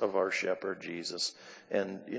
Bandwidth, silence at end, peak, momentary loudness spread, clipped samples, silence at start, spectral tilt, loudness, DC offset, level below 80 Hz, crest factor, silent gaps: 8 kHz; 0 s; -16 dBFS; 7 LU; under 0.1%; 0 s; -3 dB/octave; -34 LUFS; under 0.1%; -78 dBFS; 18 dB; none